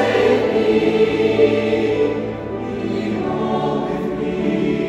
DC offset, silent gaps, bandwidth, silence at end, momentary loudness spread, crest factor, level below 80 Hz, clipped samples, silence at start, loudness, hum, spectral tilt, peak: under 0.1%; none; 10.5 kHz; 0 s; 8 LU; 14 dB; -46 dBFS; under 0.1%; 0 s; -18 LUFS; none; -7 dB/octave; -4 dBFS